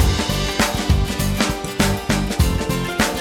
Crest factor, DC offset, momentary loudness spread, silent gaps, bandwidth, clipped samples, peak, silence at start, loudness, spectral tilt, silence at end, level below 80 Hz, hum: 16 dB; under 0.1%; 3 LU; none; 18.5 kHz; under 0.1%; -2 dBFS; 0 s; -20 LUFS; -4.5 dB/octave; 0 s; -24 dBFS; none